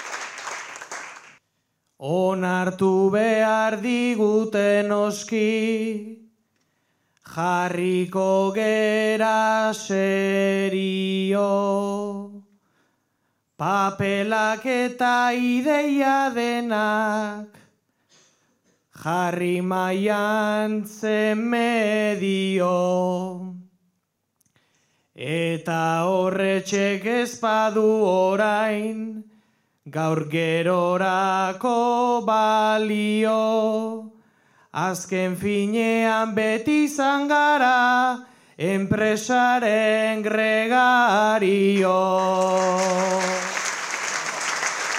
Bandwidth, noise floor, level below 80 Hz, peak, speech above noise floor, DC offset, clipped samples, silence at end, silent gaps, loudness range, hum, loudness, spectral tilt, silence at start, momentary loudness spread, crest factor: 15.5 kHz; -74 dBFS; -72 dBFS; -8 dBFS; 53 dB; under 0.1%; under 0.1%; 0 s; none; 6 LU; none; -22 LUFS; -5 dB/octave; 0 s; 9 LU; 16 dB